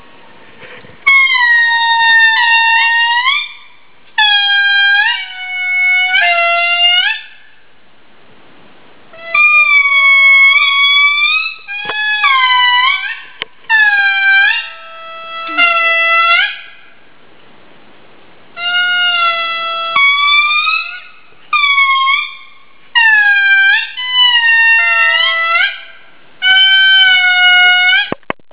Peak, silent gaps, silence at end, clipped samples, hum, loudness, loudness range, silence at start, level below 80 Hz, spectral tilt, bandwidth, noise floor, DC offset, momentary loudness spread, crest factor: 0 dBFS; none; 0.4 s; under 0.1%; none; -8 LUFS; 6 LU; 0.6 s; -64 dBFS; -2 dB/octave; 4 kHz; -48 dBFS; 1%; 13 LU; 12 dB